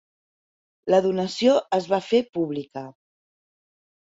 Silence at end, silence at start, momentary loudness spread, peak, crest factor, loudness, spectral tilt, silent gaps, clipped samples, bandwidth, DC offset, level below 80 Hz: 1.25 s; 0.85 s; 16 LU; -6 dBFS; 18 dB; -23 LUFS; -5.5 dB/octave; 2.29-2.33 s; under 0.1%; 8 kHz; under 0.1%; -68 dBFS